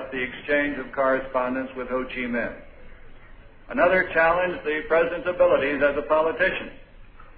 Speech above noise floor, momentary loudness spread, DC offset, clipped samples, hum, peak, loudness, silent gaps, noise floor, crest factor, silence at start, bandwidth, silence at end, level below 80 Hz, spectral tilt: 22 dB; 10 LU; under 0.1%; under 0.1%; none; -8 dBFS; -23 LUFS; none; -45 dBFS; 18 dB; 0 s; 4.9 kHz; 0.05 s; -46 dBFS; -8.5 dB/octave